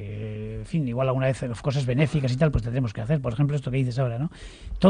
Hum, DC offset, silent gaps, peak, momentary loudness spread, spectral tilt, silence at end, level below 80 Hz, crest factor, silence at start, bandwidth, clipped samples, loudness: none; under 0.1%; none; -6 dBFS; 10 LU; -8 dB/octave; 0 s; -40 dBFS; 20 dB; 0 s; 10 kHz; under 0.1%; -26 LUFS